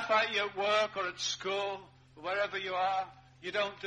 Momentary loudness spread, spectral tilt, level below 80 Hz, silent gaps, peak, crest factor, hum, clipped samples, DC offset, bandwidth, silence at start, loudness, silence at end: 13 LU; -2 dB/octave; -72 dBFS; none; -16 dBFS; 18 dB; none; under 0.1%; under 0.1%; 10 kHz; 0 s; -33 LUFS; 0 s